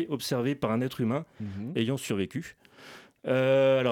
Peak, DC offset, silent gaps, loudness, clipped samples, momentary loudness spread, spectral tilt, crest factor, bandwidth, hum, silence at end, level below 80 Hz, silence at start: -14 dBFS; under 0.1%; none; -28 LUFS; under 0.1%; 21 LU; -6 dB/octave; 14 dB; 17.5 kHz; none; 0 s; -66 dBFS; 0 s